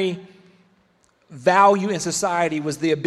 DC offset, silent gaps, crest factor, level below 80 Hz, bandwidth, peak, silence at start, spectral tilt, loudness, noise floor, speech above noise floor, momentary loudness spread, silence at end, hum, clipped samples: under 0.1%; none; 18 dB; -64 dBFS; 14.5 kHz; -4 dBFS; 0 s; -4.5 dB/octave; -19 LUFS; -61 dBFS; 42 dB; 9 LU; 0 s; none; under 0.1%